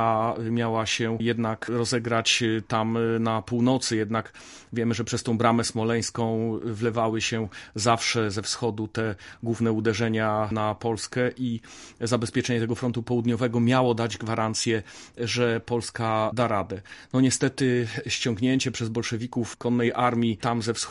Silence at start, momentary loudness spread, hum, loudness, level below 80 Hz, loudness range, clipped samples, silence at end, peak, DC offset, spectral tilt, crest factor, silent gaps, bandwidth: 0 s; 7 LU; none; -26 LUFS; -54 dBFS; 2 LU; under 0.1%; 0 s; -6 dBFS; under 0.1%; -5 dB/octave; 20 dB; none; 11.5 kHz